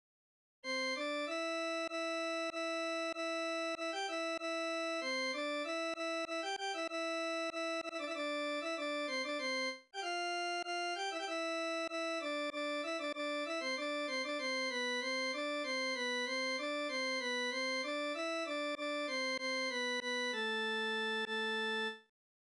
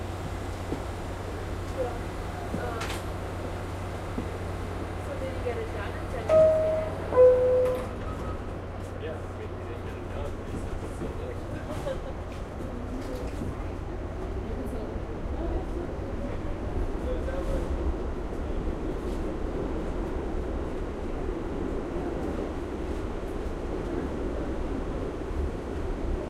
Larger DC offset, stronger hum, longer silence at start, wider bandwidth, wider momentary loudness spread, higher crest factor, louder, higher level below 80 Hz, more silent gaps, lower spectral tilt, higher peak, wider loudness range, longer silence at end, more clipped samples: neither; neither; first, 0.65 s vs 0 s; second, 11 kHz vs 14.5 kHz; second, 3 LU vs 9 LU; second, 10 dB vs 22 dB; second, -37 LUFS vs -31 LUFS; second, -86 dBFS vs -36 dBFS; neither; second, -1 dB/octave vs -7 dB/octave; second, -28 dBFS vs -8 dBFS; second, 2 LU vs 11 LU; first, 0.5 s vs 0 s; neither